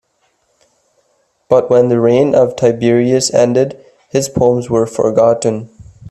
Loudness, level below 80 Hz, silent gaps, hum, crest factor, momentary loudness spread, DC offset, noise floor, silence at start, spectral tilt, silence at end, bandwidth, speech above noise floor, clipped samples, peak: -13 LUFS; -48 dBFS; none; none; 14 dB; 7 LU; under 0.1%; -61 dBFS; 1.5 s; -5.5 dB/octave; 0 s; 13.5 kHz; 49 dB; under 0.1%; 0 dBFS